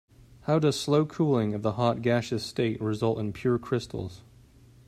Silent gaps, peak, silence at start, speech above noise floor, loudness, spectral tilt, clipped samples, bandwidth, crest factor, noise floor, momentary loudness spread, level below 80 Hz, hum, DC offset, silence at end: none; -10 dBFS; 0.45 s; 28 dB; -27 LUFS; -6.5 dB/octave; under 0.1%; 14.5 kHz; 18 dB; -55 dBFS; 7 LU; -58 dBFS; none; under 0.1%; 0.7 s